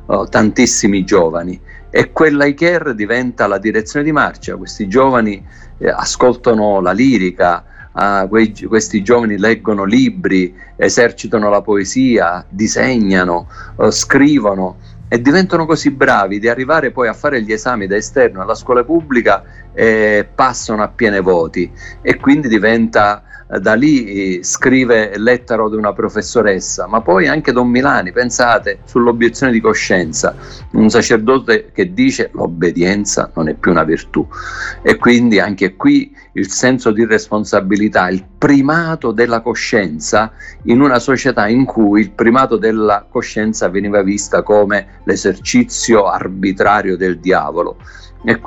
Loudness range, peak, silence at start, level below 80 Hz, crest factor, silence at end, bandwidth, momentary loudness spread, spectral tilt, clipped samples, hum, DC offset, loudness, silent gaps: 2 LU; 0 dBFS; 0 s; -38 dBFS; 12 dB; 0 s; 8.8 kHz; 7 LU; -4.5 dB/octave; under 0.1%; none; under 0.1%; -13 LUFS; none